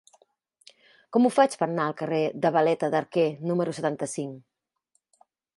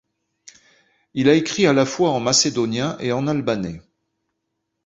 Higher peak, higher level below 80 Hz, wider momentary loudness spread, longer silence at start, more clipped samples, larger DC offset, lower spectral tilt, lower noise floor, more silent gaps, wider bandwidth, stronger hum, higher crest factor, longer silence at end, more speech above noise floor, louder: second, -8 dBFS vs -2 dBFS; second, -78 dBFS vs -56 dBFS; about the same, 8 LU vs 10 LU; about the same, 1.1 s vs 1.15 s; neither; neither; first, -6 dB/octave vs -4 dB/octave; about the same, -74 dBFS vs -77 dBFS; neither; first, 11.5 kHz vs 8 kHz; neither; about the same, 20 dB vs 20 dB; about the same, 1.15 s vs 1.05 s; second, 50 dB vs 58 dB; second, -25 LUFS vs -19 LUFS